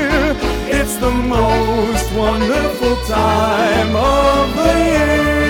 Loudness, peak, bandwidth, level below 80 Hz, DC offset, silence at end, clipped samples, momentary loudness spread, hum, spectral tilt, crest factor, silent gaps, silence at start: -15 LUFS; 0 dBFS; 19 kHz; -24 dBFS; under 0.1%; 0 s; under 0.1%; 4 LU; none; -5 dB/octave; 14 dB; none; 0 s